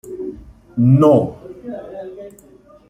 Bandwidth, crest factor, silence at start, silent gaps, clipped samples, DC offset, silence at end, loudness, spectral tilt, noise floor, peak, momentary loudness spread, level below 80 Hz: 10.5 kHz; 16 dB; 0.05 s; none; under 0.1%; under 0.1%; 0.6 s; -14 LUFS; -10 dB/octave; -47 dBFS; -2 dBFS; 22 LU; -50 dBFS